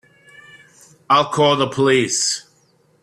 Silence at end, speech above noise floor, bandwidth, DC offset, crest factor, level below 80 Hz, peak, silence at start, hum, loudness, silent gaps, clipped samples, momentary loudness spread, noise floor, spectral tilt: 0.6 s; 42 dB; 13 kHz; under 0.1%; 16 dB; -60 dBFS; -4 dBFS; 1.1 s; none; -17 LUFS; none; under 0.1%; 4 LU; -58 dBFS; -3 dB/octave